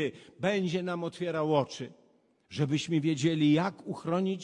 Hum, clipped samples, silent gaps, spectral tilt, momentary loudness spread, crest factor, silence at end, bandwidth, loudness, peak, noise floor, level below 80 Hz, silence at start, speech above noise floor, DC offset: none; under 0.1%; none; -6.5 dB/octave; 12 LU; 18 dB; 0 s; 10.5 kHz; -30 LUFS; -12 dBFS; -64 dBFS; -72 dBFS; 0 s; 34 dB; under 0.1%